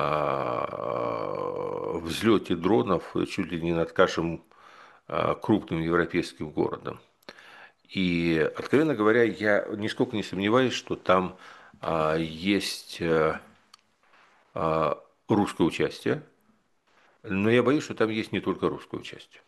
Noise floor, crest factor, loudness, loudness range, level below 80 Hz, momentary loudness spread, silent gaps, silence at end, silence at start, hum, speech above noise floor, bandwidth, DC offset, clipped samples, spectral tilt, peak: -67 dBFS; 22 dB; -27 LUFS; 4 LU; -58 dBFS; 10 LU; none; 0.25 s; 0 s; none; 41 dB; 12.5 kHz; under 0.1%; under 0.1%; -6 dB/octave; -6 dBFS